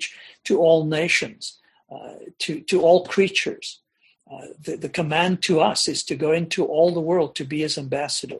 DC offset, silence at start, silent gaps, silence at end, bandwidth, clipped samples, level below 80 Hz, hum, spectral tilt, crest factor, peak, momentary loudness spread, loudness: under 0.1%; 0 s; none; 0 s; 12 kHz; under 0.1%; -64 dBFS; none; -4 dB/octave; 18 dB; -4 dBFS; 18 LU; -21 LUFS